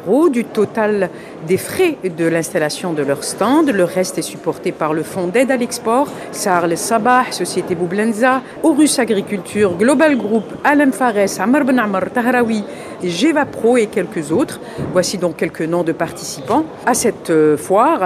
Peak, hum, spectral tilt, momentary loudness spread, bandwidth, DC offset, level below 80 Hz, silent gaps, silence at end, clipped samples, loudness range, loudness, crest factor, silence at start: 0 dBFS; none; -4.5 dB/octave; 8 LU; 15 kHz; under 0.1%; -54 dBFS; none; 0 s; under 0.1%; 3 LU; -16 LUFS; 16 dB; 0 s